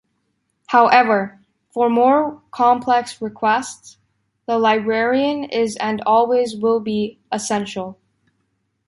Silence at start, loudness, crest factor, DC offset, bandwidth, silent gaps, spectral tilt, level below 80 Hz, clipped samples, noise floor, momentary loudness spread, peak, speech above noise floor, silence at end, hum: 0.7 s; -18 LUFS; 18 dB; under 0.1%; 11.5 kHz; none; -4.5 dB/octave; -64 dBFS; under 0.1%; -70 dBFS; 15 LU; -2 dBFS; 52 dB; 0.95 s; none